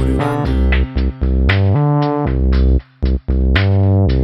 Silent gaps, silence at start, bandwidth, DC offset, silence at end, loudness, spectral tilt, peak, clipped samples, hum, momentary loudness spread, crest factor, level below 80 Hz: none; 0 s; 5.8 kHz; under 0.1%; 0 s; -15 LUFS; -8.5 dB/octave; 0 dBFS; under 0.1%; none; 5 LU; 14 dB; -16 dBFS